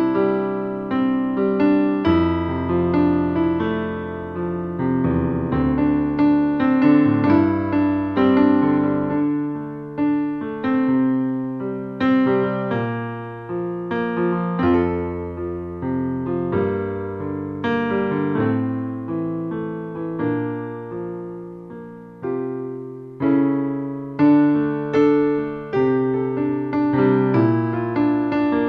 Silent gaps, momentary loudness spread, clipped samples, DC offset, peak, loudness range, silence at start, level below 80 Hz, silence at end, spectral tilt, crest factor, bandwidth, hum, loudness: none; 12 LU; under 0.1%; under 0.1%; -4 dBFS; 7 LU; 0 s; -46 dBFS; 0 s; -10 dB/octave; 16 dB; 5.4 kHz; none; -20 LUFS